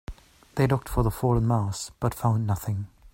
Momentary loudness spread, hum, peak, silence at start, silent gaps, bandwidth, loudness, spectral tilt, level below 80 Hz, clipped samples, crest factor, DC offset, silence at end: 9 LU; none; -6 dBFS; 0.1 s; none; 16.5 kHz; -26 LUFS; -7 dB/octave; -40 dBFS; under 0.1%; 20 dB; under 0.1%; 0.25 s